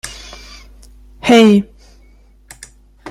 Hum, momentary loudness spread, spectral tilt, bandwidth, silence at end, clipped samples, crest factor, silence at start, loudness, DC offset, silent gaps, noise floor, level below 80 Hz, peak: none; 25 LU; -5.5 dB/octave; 13.5 kHz; 0 s; under 0.1%; 16 dB; 0.05 s; -11 LUFS; under 0.1%; none; -46 dBFS; -42 dBFS; 0 dBFS